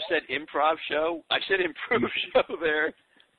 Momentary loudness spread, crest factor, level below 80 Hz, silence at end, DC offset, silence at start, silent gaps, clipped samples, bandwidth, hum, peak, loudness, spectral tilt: 3 LU; 18 dB; -60 dBFS; 0.45 s; under 0.1%; 0 s; none; under 0.1%; 4.6 kHz; none; -10 dBFS; -26 LUFS; -6.5 dB/octave